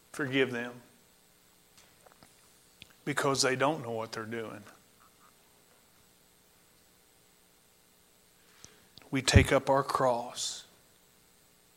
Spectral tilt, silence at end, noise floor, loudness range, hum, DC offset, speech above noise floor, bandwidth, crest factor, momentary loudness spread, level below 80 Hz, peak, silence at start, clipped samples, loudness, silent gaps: -4.5 dB/octave; 1.15 s; -64 dBFS; 14 LU; none; under 0.1%; 35 dB; 16 kHz; 28 dB; 19 LU; -48 dBFS; -6 dBFS; 0.15 s; under 0.1%; -30 LUFS; none